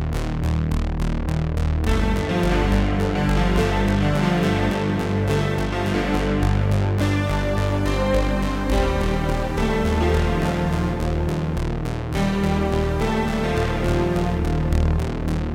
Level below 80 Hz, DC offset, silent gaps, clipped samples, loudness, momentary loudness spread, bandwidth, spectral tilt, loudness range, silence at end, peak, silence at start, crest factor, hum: -26 dBFS; under 0.1%; none; under 0.1%; -22 LUFS; 4 LU; 16 kHz; -7 dB/octave; 2 LU; 0 s; -6 dBFS; 0 s; 14 dB; none